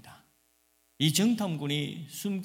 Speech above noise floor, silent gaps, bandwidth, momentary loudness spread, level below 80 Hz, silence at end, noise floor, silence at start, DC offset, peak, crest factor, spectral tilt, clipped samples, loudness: 41 dB; none; 17.5 kHz; 11 LU; -74 dBFS; 0 s; -69 dBFS; 0.05 s; under 0.1%; -10 dBFS; 20 dB; -4.5 dB/octave; under 0.1%; -29 LUFS